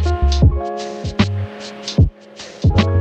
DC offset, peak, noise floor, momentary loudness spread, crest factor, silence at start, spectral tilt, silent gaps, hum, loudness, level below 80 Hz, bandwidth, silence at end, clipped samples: under 0.1%; -2 dBFS; -37 dBFS; 13 LU; 16 dB; 0 s; -6.5 dB/octave; none; none; -18 LUFS; -22 dBFS; 8.2 kHz; 0 s; under 0.1%